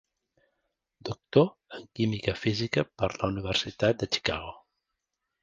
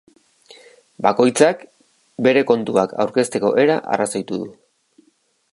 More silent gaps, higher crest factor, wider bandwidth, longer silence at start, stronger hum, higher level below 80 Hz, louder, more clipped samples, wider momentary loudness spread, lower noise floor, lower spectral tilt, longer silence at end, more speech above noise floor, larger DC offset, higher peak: neither; about the same, 24 dB vs 20 dB; second, 9.4 kHz vs 11.5 kHz; about the same, 1.05 s vs 1 s; neither; first, -52 dBFS vs -66 dBFS; second, -28 LUFS vs -18 LUFS; neither; about the same, 15 LU vs 13 LU; first, -84 dBFS vs -62 dBFS; about the same, -5.5 dB/octave vs -4.5 dB/octave; second, 0.85 s vs 1 s; first, 55 dB vs 45 dB; neither; second, -8 dBFS vs 0 dBFS